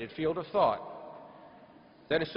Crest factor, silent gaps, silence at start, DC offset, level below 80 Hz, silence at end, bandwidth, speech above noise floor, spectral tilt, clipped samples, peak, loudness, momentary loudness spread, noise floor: 20 dB; none; 0 s; under 0.1%; -64 dBFS; 0 s; 5.6 kHz; 26 dB; -8.5 dB/octave; under 0.1%; -12 dBFS; -31 LUFS; 23 LU; -56 dBFS